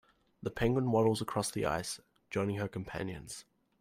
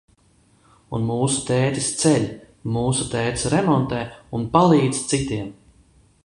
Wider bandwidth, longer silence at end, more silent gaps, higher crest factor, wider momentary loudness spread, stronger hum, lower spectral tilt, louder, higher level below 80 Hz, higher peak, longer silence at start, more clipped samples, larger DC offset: first, 16 kHz vs 11.5 kHz; second, 0.4 s vs 0.7 s; neither; about the same, 18 dB vs 20 dB; about the same, 15 LU vs 13 LU; neither; about the same, -5.5 dB/octave vs -5 dB/octave; second, -34 LUFS vs -21 LUFS; second, -58 dBFS vs -46 dBFS; second, -18 dBFS vs -2 dBFS; second, 0.4 s vs 0.9 s; neither; neither